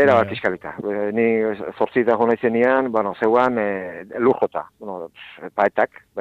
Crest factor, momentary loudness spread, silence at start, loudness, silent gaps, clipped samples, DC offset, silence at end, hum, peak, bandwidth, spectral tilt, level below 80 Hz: 18 dB; 14 LU; 0 s; -20 LUFS; none; under 0.1%; under 0.1%; 0 s; none; -2 dBFS; 7.6 kHz; -7.5 dB/octave; -62 dBFS